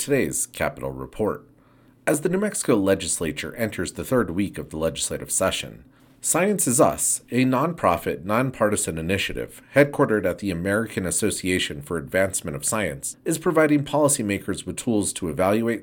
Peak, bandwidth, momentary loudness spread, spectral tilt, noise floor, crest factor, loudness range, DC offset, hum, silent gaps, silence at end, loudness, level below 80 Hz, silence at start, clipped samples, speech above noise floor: -2 dBFS; 18 kHz; 8 LU; -4 dB/octave; -55 dBFS; 20 dB; 3 LU; under 0.1%; none; none; 0 s; -23 LUFS; -50 dBFS; 0 s; under 0.1%; 32 dB